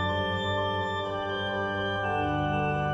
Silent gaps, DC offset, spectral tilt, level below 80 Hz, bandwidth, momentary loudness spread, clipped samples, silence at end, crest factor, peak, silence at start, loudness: none; under 0.1%; -6.5 dB/octave; -48 dBFS; 8 kHz; 3 LU; under 0.1%; 0 s; 12 dB; -16 dBFS; 0 s; -29 LUFS